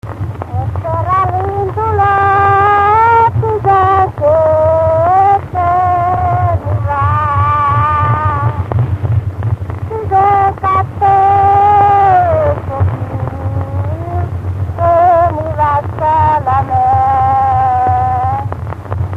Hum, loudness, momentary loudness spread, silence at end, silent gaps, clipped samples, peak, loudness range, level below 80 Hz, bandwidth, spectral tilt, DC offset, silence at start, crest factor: none; -12 LUFS; 10 LU; 0 s; none; under 0.1%; 0 dBFS; 4 LU; -30 dBFS; 5.8 kHz; -9 dB/octave; under 0.1%; 0.05 s; 12 dB